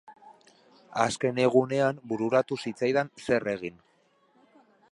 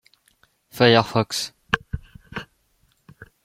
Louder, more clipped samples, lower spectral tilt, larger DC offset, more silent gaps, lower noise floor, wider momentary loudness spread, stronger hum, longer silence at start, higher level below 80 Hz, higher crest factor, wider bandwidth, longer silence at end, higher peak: second, -27 LUFS vs -20 LUFS; neither; about the same, -5.5 dB/octave vs -4.5 dB/octave; neither; neither; about the same, -66 dBFS vs -65 dBFS; second, 10 LU vs 20 LU; neither; second, 0.1 s vs 0.75 s; second, -68 dBFS vs -48 dBFS; about the same, 22 dB vs 22 dB; second, 11.5 kHz vs 16 kHz; first, 1.2 s vs 0.2 s; second, -8 dBFS vs -2 dBFS